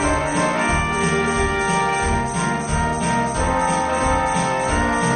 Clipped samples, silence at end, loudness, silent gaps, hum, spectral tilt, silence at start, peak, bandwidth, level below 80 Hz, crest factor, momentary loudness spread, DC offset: under 0.1%; 0 s; -20 LUFS; none; none; -4.5 dB/octave; 0 s; -6 dBFS; 11 kHz; -30 dBFS; 14 dB; 2 LU; under 0.1%